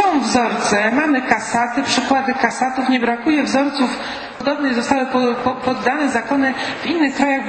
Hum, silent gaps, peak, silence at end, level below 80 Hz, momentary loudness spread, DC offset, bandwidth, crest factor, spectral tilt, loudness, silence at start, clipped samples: none; none; 0 dBFS; 0 s; -52 dBFS; 4 LU; under 0.1%; 8.8 kHz; 18 dB; -3.5 dB/octave; -17 LUFS; 0 s; under 0.1%